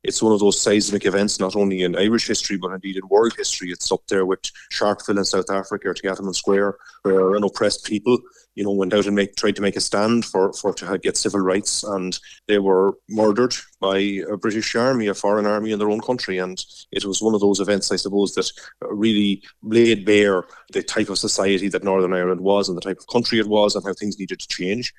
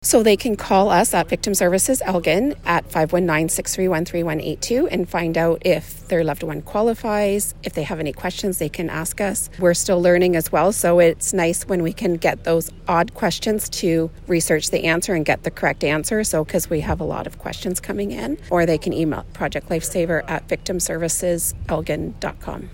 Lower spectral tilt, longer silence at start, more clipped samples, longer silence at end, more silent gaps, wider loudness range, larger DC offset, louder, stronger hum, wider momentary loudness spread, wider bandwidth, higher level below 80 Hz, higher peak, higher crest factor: about the same, -4 dB/octave vs -4.5 dB/octave; about the same, 0.05 s vs 0 s; neither; about the same, 0.1 s vs 0 s; neither; second, 2 LU vs 5 LU; neither; about the same, -20 LUFS vs -20 LUFS; neither; about the same, 9 LU vs 9 LU; second, 14 kHz vs 16.5 kHz; second, -56 dBFS vs -40 dBFS; about the same, -4 dBFS vs -2 dBFS; about the same, 16 dB vs 18 dB